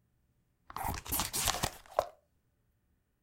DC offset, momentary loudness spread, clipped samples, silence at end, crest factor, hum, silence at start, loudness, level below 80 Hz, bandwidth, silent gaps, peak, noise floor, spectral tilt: under 0.1%; 12 LU; under 0.1%; 1.1 s; 30 dB; none; 0.7 s; -34 LUFS; -52 dBFS; 17 kHz; none; -10 dBFS; -76 dBFS; -2 dB/octave